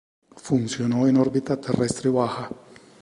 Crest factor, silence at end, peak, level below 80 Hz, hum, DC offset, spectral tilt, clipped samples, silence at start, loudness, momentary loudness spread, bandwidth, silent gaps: 18 dB; 0.45 s; -6 dBFS; -56 dBFS; none; under 0.1%; -6.5 dB/octave; under 0.1%; 0.35 s; -23 LUFS; 16 LU; 11.5 kHz; none